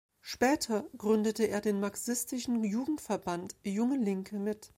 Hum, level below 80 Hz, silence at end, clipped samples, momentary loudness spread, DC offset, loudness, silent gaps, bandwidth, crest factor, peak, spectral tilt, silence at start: none; -66 dBFS; 0.1 s; under 0.1%; 7 LU; under 0.1%; -32 LUFS; none; 16.5 kHz; 18 dB; -14 dBFS; -4.5 dB/octave; 0.25 s